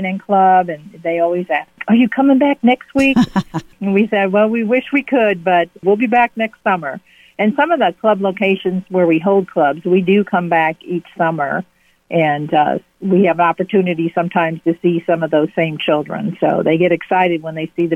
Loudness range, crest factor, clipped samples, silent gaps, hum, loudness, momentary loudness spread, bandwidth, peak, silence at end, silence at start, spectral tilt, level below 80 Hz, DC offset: 2 LU; 12 dB; under 0.1%; none; none; -15 LUFS; 8 LU; 10.5 kHz; -2 dBFS; 0 s; 0 s; -7.5 dB/octave; -54 dBFS; under 0.1%